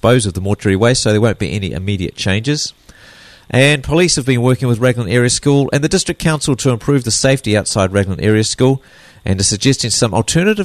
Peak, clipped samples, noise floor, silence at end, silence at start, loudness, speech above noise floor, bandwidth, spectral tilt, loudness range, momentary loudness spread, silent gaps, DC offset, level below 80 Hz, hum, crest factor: 0 dBFS; under 0.1%; -41 dBFS; 0 s; 0.05 s; -14 LUFS; 27 dB; 13.5 kHz; -4.5 dB/octave; 2 LU; 7 LU; none; under 0.1%; -38 dBFS; none; 14 dB